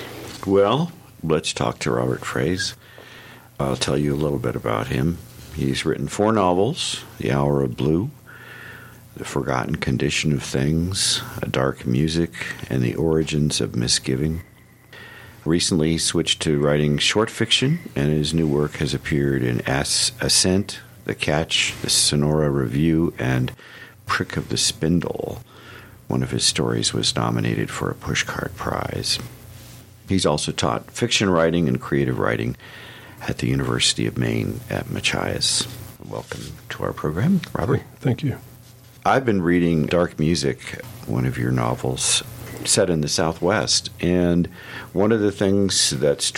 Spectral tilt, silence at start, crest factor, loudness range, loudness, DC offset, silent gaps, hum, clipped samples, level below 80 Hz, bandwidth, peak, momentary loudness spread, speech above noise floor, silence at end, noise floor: -4 dB/octave; 0 s; 18 dB; 4 LU; -21 LUFS; under 0.1%; none; none; under 0.1%; -44 dBFS; 17 kHz; -4 dBFS; 15 LU; 25 dB; 0 s; -46 dBFS